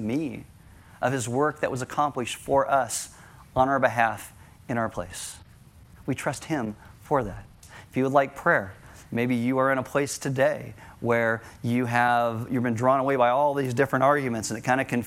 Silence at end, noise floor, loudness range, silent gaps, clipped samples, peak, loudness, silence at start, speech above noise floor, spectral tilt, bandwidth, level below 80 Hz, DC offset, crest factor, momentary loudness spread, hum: 0 s; -51 dBFS; 7 LU; none; under 0.1%; -4 dBFS; -25 LUFS; 0 s; 26 dB; -5.5 dB/octave; 16.5 kHz; -56 dBFS; under 0.1%; 20 dB; 13 LU; none